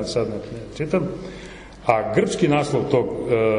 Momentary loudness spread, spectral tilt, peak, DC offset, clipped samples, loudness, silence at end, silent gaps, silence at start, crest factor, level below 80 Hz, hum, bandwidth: 15 LU; -6 dB/octave; -4 dBFS; under 0.1%; under 0.1%; -22 LUFS; 0 s; none; 0 s; 18 dB; -46 dBFS; none; 11 kHz